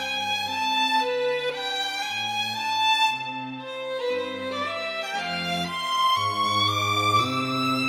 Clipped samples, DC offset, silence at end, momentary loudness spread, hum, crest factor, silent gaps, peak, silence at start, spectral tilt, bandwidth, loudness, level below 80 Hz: under 0.1%; under 0.1%; 0 s; 8 LU; none; 16 dB; none; -10 dBFS; 0 s; -3 dB/octave; 16.5 kHz; -24 LUFS; -66 dBFS